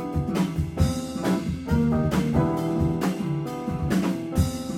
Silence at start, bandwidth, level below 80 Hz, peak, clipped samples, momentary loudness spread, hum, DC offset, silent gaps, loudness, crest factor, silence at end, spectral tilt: 0 s; 16.5 kHz; -36 dBFS; -8 dBFS; under 0.1%; 5 LU; none; under 0.1%; none; -25 LUFS; 16 dB; 0 s; -7 dB/octave